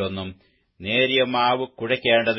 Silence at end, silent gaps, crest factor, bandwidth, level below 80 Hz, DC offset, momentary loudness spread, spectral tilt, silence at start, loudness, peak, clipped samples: 0 s; none; 18 dB; 5.8 kHz; -60 dBFS; under 0.1%; 15 LU; -9 dB/octave; 0 s; -21 LUFS; -6 dBFS; under 0.1%